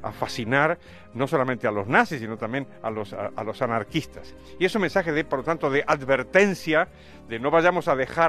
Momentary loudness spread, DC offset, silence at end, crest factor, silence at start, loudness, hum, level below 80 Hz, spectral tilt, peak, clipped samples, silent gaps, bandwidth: 11 LU; under 0.1%; 0 s; 20 dB; 0 s; -24 LUFS; none; -54 dBFS; -5.5 dB/octave; -4 dBFS; under 0.1%; none; 13.5 kHz